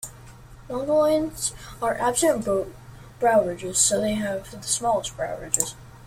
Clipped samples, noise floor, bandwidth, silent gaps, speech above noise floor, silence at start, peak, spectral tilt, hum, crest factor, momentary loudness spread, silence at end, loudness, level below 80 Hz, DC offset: under 0.1%; -45 dBFS; 16.5 kHz; none; 21 dB; 0 s; -4 dBFS; -3 dB/octave; none; 22 dB; 11 LU; 0 s; -24 LUFS; -50 dBFS; under 0.1%